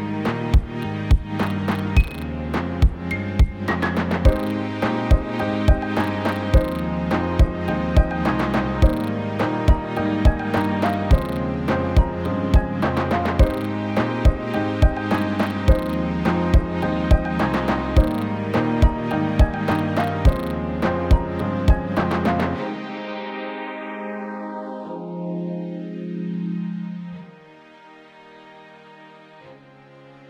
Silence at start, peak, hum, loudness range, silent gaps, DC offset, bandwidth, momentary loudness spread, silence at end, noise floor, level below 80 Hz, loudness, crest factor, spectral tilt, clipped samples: 0 s; -4 dBFS; none; 9 LU; none; under 0.1%; 16 kHz; 10 LU; 0.05 s; -47 dBFS; -24 dBFS; -22 LUFS; 18 dB; -8 dB/octave; under 0.1%